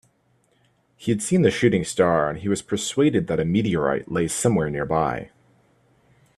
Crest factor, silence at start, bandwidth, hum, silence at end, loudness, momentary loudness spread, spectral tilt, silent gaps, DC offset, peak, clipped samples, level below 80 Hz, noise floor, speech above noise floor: 20 dB; 1 s; 13.5 kHz; none; 1.1 s; -22 LUFS; 6 LU; -5.5 dB/octave; none; under 0.1%; -4 dBFS; under 0.1%; -52 dBFS; -64 dBFS; 43 dB